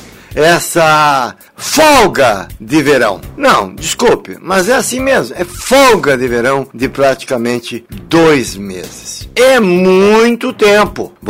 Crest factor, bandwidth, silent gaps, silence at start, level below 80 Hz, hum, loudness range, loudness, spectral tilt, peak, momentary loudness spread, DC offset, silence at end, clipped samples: 10 dB; 16.5 kHz; none; 0 s; -38 dBFS; none; 3 LU; -10 LUFS; -4 dB/octave; 0 dBFS; 13 LU; under 0.1%; 0 s; under 0.1%